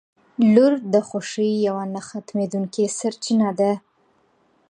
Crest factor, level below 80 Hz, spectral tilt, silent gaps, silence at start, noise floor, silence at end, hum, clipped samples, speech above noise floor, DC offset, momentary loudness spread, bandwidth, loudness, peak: 18 dB; -70 dBFS; -5.5 dB/octave; none; 0.4 s; -62 dBFS; 0.95 s; none; under 0.1%; 42 dB; under 0.1%; 13 LU; 10 kHz; -21 LUFS; -2 dBFS